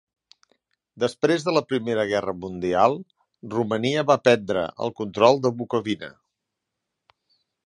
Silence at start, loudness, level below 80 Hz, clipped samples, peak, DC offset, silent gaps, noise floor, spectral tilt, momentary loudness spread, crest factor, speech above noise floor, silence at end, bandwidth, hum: 0.95 s; -23 LUFS; -60 dBFS; under 0.1%; -2 dBFS; under 0.1%; none; -83 dBFS; -5.5 dB/octave; 11 LU; 22 dB; 60 dB; 1.55 s; 11 kHz; none